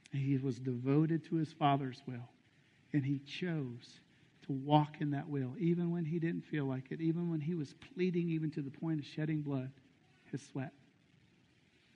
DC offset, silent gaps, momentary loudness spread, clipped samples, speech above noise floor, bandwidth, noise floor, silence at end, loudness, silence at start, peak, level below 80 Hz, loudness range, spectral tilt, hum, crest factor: under 0.1%; none; 14 LU; under 0.1%; 33 dB; 8.8 kHz; -69 dBFS; 1.25 s; -37 LUFS; 0.1 s; -14 dBFS; -78 dBFS; 4 LU; -8.5 dB/octave; none; 24 dB